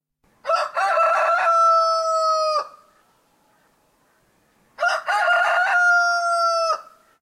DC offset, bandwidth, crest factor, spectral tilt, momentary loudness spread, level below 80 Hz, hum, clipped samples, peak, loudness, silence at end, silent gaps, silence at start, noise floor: under 0.1%; 13.5 kHz; 12 dB; 1.5 dB/octave; 8 LU; -74 dBFS; none; under 0.1%; -8 dBFS; -19 LUFS; 0.4 s; none; 0.45 s; -62 dBFS